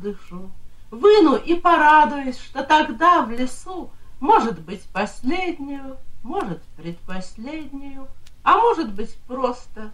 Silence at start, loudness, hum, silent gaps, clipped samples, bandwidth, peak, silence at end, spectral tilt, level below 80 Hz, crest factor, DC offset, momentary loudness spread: 0 s; -19 LUFS; none; none; under 0.1%; 11.5 kHz; -4 dBFS; 0 s; -5 dB/octave; -40 dBFS; 18 dB; under 0.1%; 21 LU